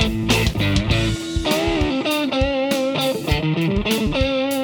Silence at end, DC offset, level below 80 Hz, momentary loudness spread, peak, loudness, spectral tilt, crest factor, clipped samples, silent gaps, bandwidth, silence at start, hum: 0 s; under 0.1%; -30 dBFS; 2 LU; -2 dBFS; -20 LUFS; -5 dB/octave; 16 dB; under 0.1%; none; over 20 kHz; 0 s; none